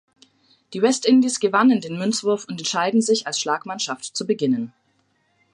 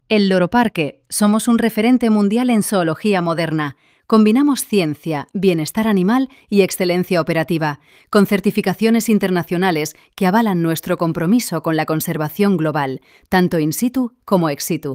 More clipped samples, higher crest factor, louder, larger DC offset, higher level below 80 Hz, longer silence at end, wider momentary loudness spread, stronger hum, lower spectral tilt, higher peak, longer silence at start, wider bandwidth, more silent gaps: neither; about the same, 18 dB vs 16 dB; second, -21 LUFS vs -17 LUFS; neither; second, -74 dBFS vs -54 dBFS; first, 0.85 s vs 0 s; about the same, 9 LU vs 7 LU; neither; second, -3.5 dB/octave vs -5.5 dB/octave; about the same, -4 dBFS vs -2 dBFS; first, 0.7 s vs 0.1 s; second, 11.5 kHz vs 16.5 kHz; neither